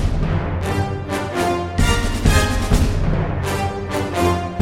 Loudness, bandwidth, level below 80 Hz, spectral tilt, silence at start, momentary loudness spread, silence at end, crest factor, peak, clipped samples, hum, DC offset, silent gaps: -20 LUFS; 16.5 kHz; -24 dBFS; -5.5 dB/octave; 0 s; 6 LU; 0 s; 16 dB; -2 dBFS; under 0.1%; none; under 0.1%; none